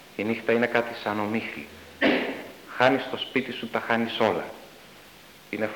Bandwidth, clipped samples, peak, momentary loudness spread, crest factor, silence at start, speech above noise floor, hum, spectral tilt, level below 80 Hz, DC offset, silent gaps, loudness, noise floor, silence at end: 19 kHz; under 0.1%; -4 dBFS; 16 LU; 24 dB; 0 s; 24 dB; none; -5.5 dB/octave; -66 dBFS; under 0.1%; none; -26 LUFS; -50 dBFS; 0 s